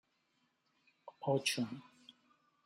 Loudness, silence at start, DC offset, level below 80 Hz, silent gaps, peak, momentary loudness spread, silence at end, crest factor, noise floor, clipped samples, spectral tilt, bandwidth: -37 LUFS; 1.05 s; under 0.1%; -86 dBFS; none; -20 dBFS; 25 LU; 0.55 s; 22 dB; -79 dBFS; under 0.1%; -4 dB/octave; 14 kHz